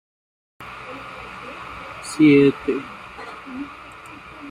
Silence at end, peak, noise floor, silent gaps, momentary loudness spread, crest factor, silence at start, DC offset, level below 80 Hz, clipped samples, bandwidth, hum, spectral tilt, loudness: 0 s; -4 dBFS; -40 dBFS; none; 24 LU; 18 dB; 0.6 s; under 0.1%; -54 dBFS; under 0.1%; 11 kHz; none; -6.5 dB/octave; -17 LUFS